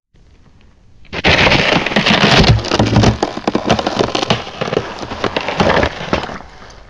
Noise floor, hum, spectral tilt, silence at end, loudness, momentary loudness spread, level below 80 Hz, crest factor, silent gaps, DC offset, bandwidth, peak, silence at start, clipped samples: -45 dBFS; none; -5 dB/octave; 0.15 s; -13 LUFS; 11 LU; -28 dBFS; 14 dB; none; under 0.1%; 11 kHz; 0 dBFS; 1 s; under 0.1%